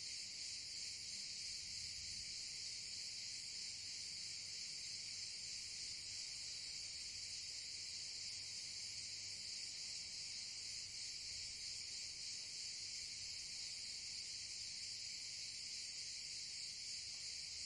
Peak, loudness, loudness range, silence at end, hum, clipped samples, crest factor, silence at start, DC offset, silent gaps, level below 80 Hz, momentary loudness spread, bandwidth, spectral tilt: -34 dBFS; -46 LUFS; 0 LU; 0 s; none; under 0.1%; 14 dB; 0 s; under 0.1%; none; -76 dBFS; 1 LU; 11.5 kHz; 1.5 dB/octave